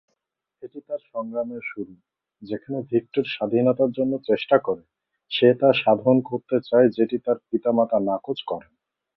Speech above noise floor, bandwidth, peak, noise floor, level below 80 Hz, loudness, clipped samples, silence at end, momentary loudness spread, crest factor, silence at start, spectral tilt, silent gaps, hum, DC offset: 57 dB; 5.8 kHz; -2 dBFS; -80 dBFS; -68 dBFS; -22 LUFS; under 0.1%; 0.55 s; 15 LU; 20 dB; 0.65 s; -9.5 dB/octave; none; none; under 0.1%